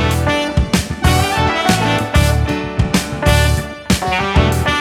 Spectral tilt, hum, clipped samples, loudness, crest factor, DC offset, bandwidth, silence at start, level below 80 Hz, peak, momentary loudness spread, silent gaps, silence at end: -5 dB/octave; none; under 0.1%; -15 LUFS; 14 dB; under 0.1%; 16.5 kHz; 0 s; -22 dBFS; 0 dBFS; 4 LU; none; 0 s